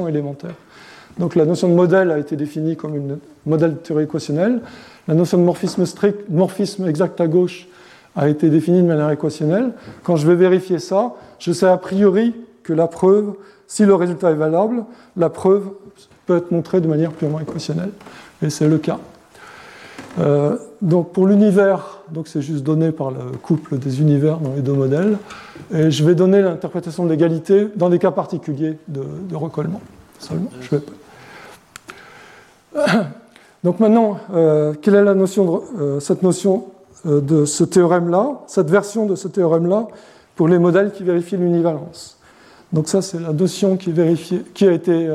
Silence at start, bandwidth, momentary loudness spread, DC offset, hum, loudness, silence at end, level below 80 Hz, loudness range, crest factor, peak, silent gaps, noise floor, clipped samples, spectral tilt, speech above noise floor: 0 s; 13.5 kHz; 14 LU; under 0.1%; none; -17 LUFS; 0 s; -62 dBFS; 5 LU; 16 dB; -2 dBFS; none; -47 dBFS; under 0.1%; -7 dB/octave; 30 dB